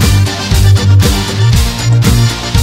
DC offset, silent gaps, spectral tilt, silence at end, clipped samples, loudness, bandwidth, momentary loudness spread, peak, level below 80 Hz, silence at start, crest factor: under 0.1%; none; -5 dB/octave; 0 s; under 0.1%; -10 LUFS; 16.5 kHz; 4 LU; 0 dBFS; -16 dBFS; 0 s; 8 dB